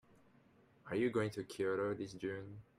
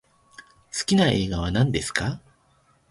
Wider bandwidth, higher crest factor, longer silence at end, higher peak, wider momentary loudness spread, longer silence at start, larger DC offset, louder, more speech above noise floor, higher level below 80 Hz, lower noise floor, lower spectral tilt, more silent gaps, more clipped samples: first, 14.5 kHz vs 11.5 kHz; about the same, 16 dB vs 20 dB; second, 0.15 s vs 0.7 s; second, -24 dBFS vs -6 dBFS; second, 9 LU vs 12 LU; first, 0.85 s vs 0.4 s; neither; second, -40 LUFS vs -23 LUFS; second, 29 dB vs 40 dB; second, -74 dBFS vs -42 dBFS; first, -68 dBFS vs -62 dBFS; first, -6.5 dB/octave vs -5 dB/octave; neither; neither